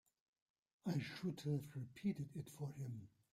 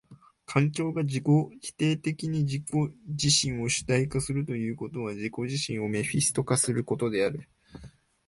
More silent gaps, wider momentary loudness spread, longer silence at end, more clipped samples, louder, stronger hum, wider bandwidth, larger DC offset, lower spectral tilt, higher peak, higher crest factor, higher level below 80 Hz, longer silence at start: neither; about the same, 7 LU vs 9 LU; second, 0.25 s vs 0.4 s; neither; second, -47 LUFS vs -28 LUFS; neither; first, 15.5 kHz vs 11.5 kHz; neither; first, -7 dB/octave vs -4.5 dB/octave; second, -30 dBFS vs -10 dBFS; about the same, 16 dB vs 18 dB; second, -78 dBFS vs -56 dBFS; first, 0.85 s vs 0.1 s